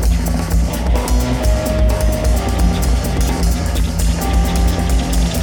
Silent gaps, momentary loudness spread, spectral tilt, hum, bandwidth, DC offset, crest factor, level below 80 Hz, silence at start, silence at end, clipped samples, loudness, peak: none; 2 LU; -5.5 dB/octave; none; 19.5 kHz; under 0.1%; 12 dB; -16 dBFS; 0 s; 0 s; under 0.1%; -17 LUFS; -2 dBFS